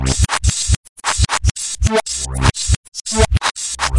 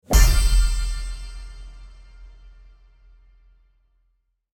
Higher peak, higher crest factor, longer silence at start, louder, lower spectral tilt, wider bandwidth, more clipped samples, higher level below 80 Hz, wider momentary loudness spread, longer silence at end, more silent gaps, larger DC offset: about the same, 0 dBFS vs -2 dBFS; about the same, 16 dB vs 20 dB; about the same, 0 s vs 0.1 s; first, -17 LUFS vs -22 LUFS; about the same, -3.5 dB/octave vs -3.5 dB/octave; second, 11.5 kHz vs 17.5 kHz; neither; about the same, -22 dBFS vs -24 dBFS; second, 4 LU vs 26 LU; second, 0 s vs 2.3 s; first, 0.76-0.96 s, 1.51-1.55 s, 2.76-2.92 s vs none; neither